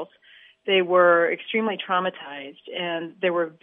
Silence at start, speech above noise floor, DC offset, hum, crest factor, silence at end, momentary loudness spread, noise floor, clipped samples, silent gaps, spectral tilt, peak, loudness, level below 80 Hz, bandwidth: 0 s; 30 dB; under 0.1%; none; 18 dB; 0.1 s; 19 LU; -53 dBFS; under 0.1%; none; -8.5 dB/octave; -6 dBFS; -22 LUFS; -82 dBFS; 3.8 kHz